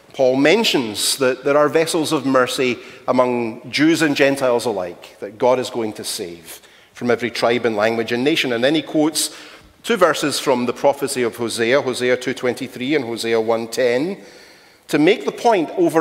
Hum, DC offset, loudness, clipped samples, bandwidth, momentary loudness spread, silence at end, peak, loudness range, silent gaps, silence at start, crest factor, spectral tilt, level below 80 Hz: none; under 0.1%; -18 LUFS; under 0.1%; 16 kHz; 10 LU; 0 s; 0 dBFS; 4 LU; none; 0.15 s; 18 dB; -3.5 dB/octave; -62 dBFS